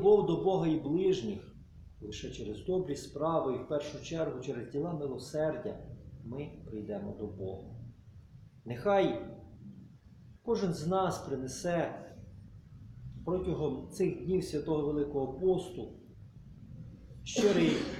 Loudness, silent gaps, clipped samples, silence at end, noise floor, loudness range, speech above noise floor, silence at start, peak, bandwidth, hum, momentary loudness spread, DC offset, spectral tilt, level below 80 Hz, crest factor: -34 LUFS; none; under 0.1%; 0 s; -56 dBFS; 5 LU; 23 dB; 0 s; -14 dBFS; 13 kHz; none; 22 LU; under 0.1%; -6 dB/octave; -56 dBFS; 20 dB